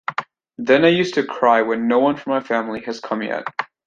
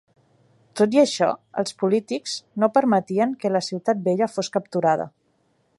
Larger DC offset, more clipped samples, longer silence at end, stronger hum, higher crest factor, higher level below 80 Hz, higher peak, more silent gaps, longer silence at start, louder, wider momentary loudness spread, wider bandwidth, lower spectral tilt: neither; neither; second, 0.2 s vs 0.7 s; neither; about the same, 18 dB vs 18 dB; first, -62 dBFS vs -72 dBFS; about the same, -2 dBFS vs -4 dBFS; neither; second, 0.1 s vs 0.75 s; first, -19 LUFS vs -22 LUFS; first, 13 LU vs 10 LU; second, 7.6 kHz vs 11.5 kHz; about the same, -5.5 dB/octave vs -5 dB/octave